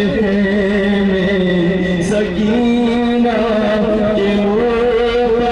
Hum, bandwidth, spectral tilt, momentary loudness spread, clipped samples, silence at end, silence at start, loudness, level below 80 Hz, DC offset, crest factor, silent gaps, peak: none; 11 kHz; -7 dB/octave; 1 LU; under 0.1%; 0 s; 0 s; -14 LUFS; -34 dBFS; under 0.1%; 10 dB; none; -4 dBFS